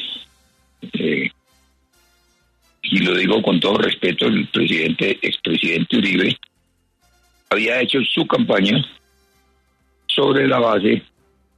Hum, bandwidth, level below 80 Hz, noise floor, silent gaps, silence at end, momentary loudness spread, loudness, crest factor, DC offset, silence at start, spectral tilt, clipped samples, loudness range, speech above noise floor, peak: none; 11.5 kHz; -60 dBFS; -64 dBFS; none; 0.55 s; 9 LU; -18 LUFS; 16 dB; under 0.1%; 0 s; -6 dB/octave; under 0.1%; 3 LU; 47 dB; -4 dBFS